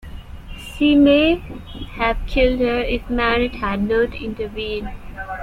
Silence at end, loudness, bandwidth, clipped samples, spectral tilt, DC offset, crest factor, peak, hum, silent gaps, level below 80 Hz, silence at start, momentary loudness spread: 0 s; -19 LUFS; 12.5 kHz; under 0.1%; -6.5 dB/octave; under 0.1%; 16 dB; -4 dBFS; none; none; -32 dBFS; 0.05 s; 21 LU